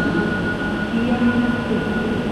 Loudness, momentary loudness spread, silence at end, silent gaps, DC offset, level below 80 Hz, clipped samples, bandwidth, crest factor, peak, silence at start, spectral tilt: -20 LUFS; 4 LU; 0 s; none; under 0.1%; -38 dBFS; under 0.1%; 11.5 kHz; 14 dB; -6 dBFS; 0 s; -7 dB/octave